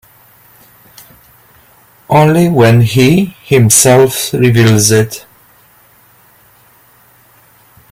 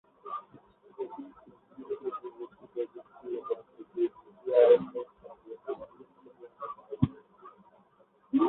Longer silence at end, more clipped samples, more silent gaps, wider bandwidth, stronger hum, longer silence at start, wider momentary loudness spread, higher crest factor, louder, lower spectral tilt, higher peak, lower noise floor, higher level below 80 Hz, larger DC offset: first, 2.7 s vs 0 s; neither; neither; first, over 20 kHz vs 4 kHz; neither; first, 2.1 s vs 0.25 s; second, 7 LU vs 23 LU; second, 12 dB vs 24 dB; first, -8 LUFS vs -32 LUFS; second, -5 dB/octave vs -11 dB/octave; first, 0 dBFS vs -10 dBFS; second, -46 dBFS vs -65 dBFS; first, -44 dBFS vs -62 dBFS; neither